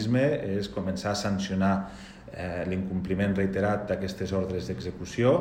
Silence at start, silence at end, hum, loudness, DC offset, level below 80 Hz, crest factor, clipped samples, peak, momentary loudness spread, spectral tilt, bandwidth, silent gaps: 0 s; 0 s; none; -29 LUFS; under 0.1%; -50 dBFS; 18 dB; under 0.1%; -10 dBFS; 9 LU; -6.5 dB/octave; 14.5 kHz; none